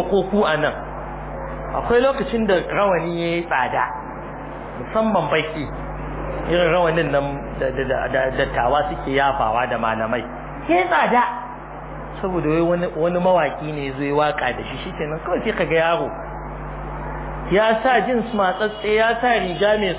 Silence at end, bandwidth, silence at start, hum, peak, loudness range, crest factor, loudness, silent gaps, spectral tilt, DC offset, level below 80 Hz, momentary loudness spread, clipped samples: 0 s; 4 kHz; 0 s; none; -6 dBFS; 3 LU; 16 dB; -20 LUFS; none; -9.5 dB/octave; under 0.1%; -38 dBFS; 14 LU; under 0.1%